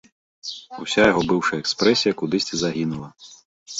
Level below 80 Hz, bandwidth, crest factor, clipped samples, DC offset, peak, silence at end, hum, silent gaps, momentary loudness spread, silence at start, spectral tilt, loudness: -54 dBFS; 8 kHz; 18 dB; under 0.1%; under 0.1%; -4 dBFS; 0 s; none; 3.45-3.66 s; 16 LU; 0.45 s; -4 dB/octave; -20 LUFS